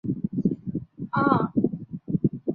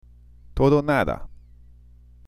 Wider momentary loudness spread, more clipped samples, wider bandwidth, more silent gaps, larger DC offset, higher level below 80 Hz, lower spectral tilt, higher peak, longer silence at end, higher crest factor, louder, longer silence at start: second, 12 LU vs 16 LU; neither; second, 4.5 kHz vs 14.5 kHz; neither; second, under 0.1% vs 0.1%; second, -54 dBFS vs -40 dBFS; first, -12 dB/octave vs -8 dB/octave; about the same, -4 dBFS vs -6 dBFS; second, 0 s vs 0.95 s; about the same, 22 dB vs 20 dB; second, -26 LUFS vs -22 LUFS; second, 0.05 s vs 0.5 s